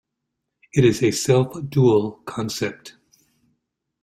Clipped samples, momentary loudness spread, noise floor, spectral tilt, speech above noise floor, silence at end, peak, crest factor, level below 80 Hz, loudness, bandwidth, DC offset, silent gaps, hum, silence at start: under 0.1%; 12 LU; -79 dBFS; -6 dB/octave; 60 dB; 1.15 s; -4 dBFS; 18 dB; -54 dBFS; -20 LUFS; 15 kHz; under 0.1%; none; none; 0.75 s